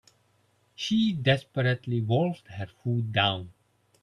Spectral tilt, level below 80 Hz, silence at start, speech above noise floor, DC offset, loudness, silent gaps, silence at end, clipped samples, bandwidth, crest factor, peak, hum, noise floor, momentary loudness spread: -6.5 dB/octave; -64 dBFS; 0.8 s; 41 dB; under 0.1%; -27 LUFS; none; 0.5 s; under 0.1%; 9.8 kHz; 20 dB; -8 dBFS; none; -68 dBFS; 12 LU